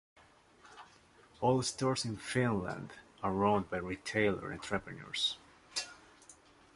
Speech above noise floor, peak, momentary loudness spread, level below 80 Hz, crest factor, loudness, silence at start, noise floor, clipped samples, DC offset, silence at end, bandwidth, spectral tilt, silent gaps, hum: 28 dB; -16 dBFS; 16 LU; -62 dBFS; 22 dB; -35 LUFS; 0.65 s; -62 dBFS; under 0.1%; under 0.1%; 0.45 s; 11.5 kHz; -4.5 dB/octave; none; none